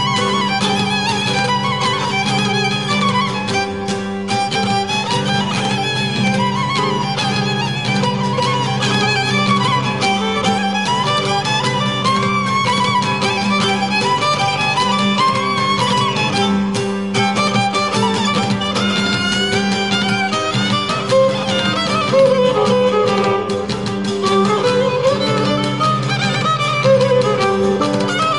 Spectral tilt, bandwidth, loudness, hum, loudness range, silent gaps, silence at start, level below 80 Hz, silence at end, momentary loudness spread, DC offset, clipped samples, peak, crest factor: -4.5 dB/octave; 11.5 kHz; -16 LUFS; none; 2 LU; none; 0 s; -46 dBFS; 0 s; 3 LU; 0.5%; under 0.1%; -2 dBFS; 14 dB